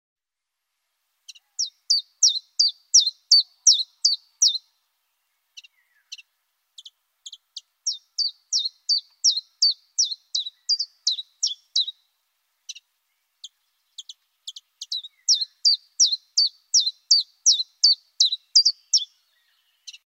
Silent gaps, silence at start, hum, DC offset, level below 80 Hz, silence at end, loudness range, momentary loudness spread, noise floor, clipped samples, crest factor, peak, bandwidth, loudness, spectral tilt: none; 1.6 s; none; under 0.1%; under -90 dBFS; 0.1 s; 12 LU; 20 LU; -85 dBFS; under 0.1%; 20 dB; -4 dBFS; 16 kHz; -20 LUFS; 12.5 dB/octave